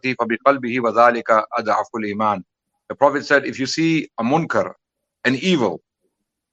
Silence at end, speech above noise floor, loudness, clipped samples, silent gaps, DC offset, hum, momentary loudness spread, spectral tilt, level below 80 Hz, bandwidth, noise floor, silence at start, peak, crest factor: 0.75 s; 55 dB; -19 LUFS; under 0.1%; none; under 0.1%; none; 8 LU; -5 dB/octave; -68 dBFS; 8.4 kHz; -73 dBFS; 0.05 s; 0 dBFS; 20 dB